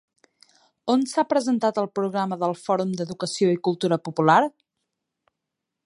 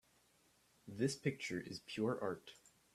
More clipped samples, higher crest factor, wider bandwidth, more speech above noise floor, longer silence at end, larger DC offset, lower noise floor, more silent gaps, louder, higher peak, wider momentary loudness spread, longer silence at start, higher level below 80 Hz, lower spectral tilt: neither; about the same, 20 dB vs 20 dB; second, 11.5 kHz vs 14 kHz; first, 61 dB vs 32 dB; first, 1.35 s vs 0.4 s; neither; first, -83 dBFS vs -74 dBFS; neither; first, -23 LUFS vs -42 LUFS; first, -4 dBFS vs -24 dBFS; second, 10 LU vs 17 LU; about the same, 0.85 s vs 0.85 s; first, -72 dBFS vs -78 dBFS; about the same, -5.5 dB/octave vs -5 dB/octave